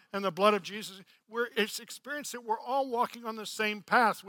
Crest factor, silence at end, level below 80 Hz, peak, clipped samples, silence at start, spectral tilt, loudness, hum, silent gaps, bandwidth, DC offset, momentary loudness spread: 22 dB; 0 s; -86 dBFS; -10 dBFS; under 0.1%; 0.15 s; -3 dB/octave; -31 LUFS; none; none; 17.5 kHz; under 0.1%; 13 LU